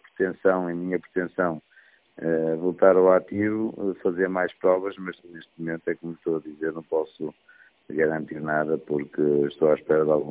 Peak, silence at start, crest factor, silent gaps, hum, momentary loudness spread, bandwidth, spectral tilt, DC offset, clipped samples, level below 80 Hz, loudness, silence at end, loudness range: -4 dBFS; 0.2 s; 22 dB; none; none; 13 LU; 4 kHz; -11 dB/octave; under 0.1%; under 0.1%; -64 dBFS; -25 LUFS; 0 s; 7 LU